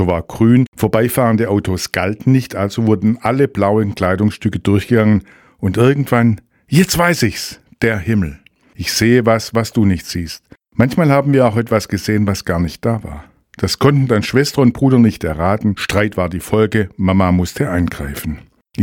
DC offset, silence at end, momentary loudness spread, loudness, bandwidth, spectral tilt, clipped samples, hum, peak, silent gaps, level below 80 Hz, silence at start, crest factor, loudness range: under 0.1%; 0 s; 11 LU; -15 LUFS; 19 kHz; -6 dB/octave; under 0.1%; none; 0 dBFS; 0.68-0.72 s; -38 dBFS; 0 s; 14 dB; 2 LU